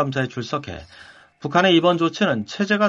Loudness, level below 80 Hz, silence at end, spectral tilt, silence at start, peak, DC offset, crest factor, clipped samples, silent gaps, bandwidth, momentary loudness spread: -20 LUFS; -54 dBFS; 0 s; -5.5 dB/octave; 0 s; -4 dBFS; under 0.1%; 18 dB; under 0.1%; none; 7.6 kHz; 17 LU